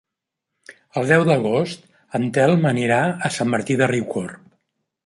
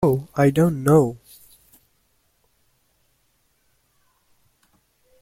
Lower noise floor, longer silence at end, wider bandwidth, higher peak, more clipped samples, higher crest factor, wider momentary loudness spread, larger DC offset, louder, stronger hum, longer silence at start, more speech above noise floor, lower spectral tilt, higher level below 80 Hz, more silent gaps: first, -82 dBFS vs -66 dBFS; second, 0.7 s vs 4.05 s; second, 11.5 kHz vs 16.5 kHz; about the same, -2 dBFS vs -4 dBFS; neither; about the same, 18 dB vs 22 dB; first, 12 LU vs 9 LU; neither; about the same, -20 LUFS vs -19 LUFS; neither; first, 0.7 s vs 0 s; first, 64 dB vs 48 dB; second, -6 dB/octave vs -8 dB/octave; second, -62 dBFS vs -54 dBFS; neither